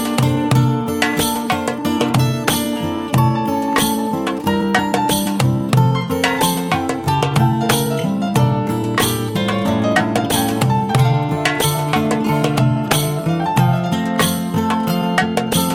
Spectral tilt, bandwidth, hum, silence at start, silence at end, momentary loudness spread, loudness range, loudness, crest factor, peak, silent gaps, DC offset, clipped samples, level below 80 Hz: -5 dB/octave; 16.5 kHz; none; 0 s; 0 s; 4 LU; 1 LU; -17 LUFS; 16 dB; -2 dBFS; none; under 0.1%; under 0.1%; -44 dBFS